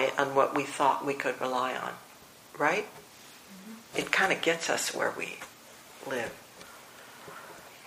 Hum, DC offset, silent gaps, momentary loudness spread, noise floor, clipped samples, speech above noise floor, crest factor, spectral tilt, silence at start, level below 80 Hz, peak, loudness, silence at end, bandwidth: none; under 0.1%; none; 22 LU; -52 dBFS; under 0.1%; 23 dB; 26 dB; -2.5 dB/octave; 0 s; -74 dBFS; -6 dBFS; -29 LUFS; 0 s; 15.5 kHz